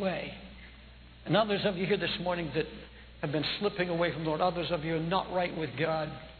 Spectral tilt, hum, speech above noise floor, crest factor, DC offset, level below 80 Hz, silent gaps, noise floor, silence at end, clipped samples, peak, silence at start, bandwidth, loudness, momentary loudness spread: -8.5 dB/octave; none; 21 dB; 20 dB; under 0.1%; -54 dBFS; none; -52 dBFS; 0 s; under 0.1%; -12 dBFS; 0 s; 4.6 kHz; -31 LUFS; 17 LU